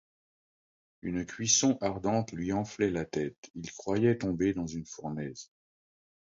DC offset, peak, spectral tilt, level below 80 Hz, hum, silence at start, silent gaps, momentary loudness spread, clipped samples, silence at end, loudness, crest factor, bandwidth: under 0.1%; -10 dBFS; -4 dB/octave; -58 dBFS; none; 1.05 s; 3.38-3.43 s, 3.50-3.54 s; 15 LU; under 0.1%; 0.75 s; -31 LUFS; 22 dB; 7.8 kHz